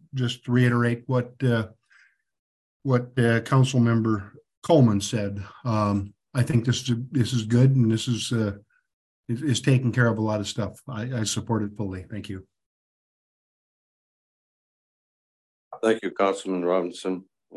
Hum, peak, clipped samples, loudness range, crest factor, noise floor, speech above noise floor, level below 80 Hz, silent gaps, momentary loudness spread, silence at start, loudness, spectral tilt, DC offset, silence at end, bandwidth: none; -6 dBFS; under 0.1%; 10 LU; 18 dB; -60 dBFS; 37 dB; -54 dBFS; 2.39-2.80 s, 4.57-4.62 s, 8.93-9.23 s, 12.66-15.71 s; 13 LU; 0.15 s; -24 LUFS; -6 dB/octave; under 0.1%; 0.35 s; 12 kHz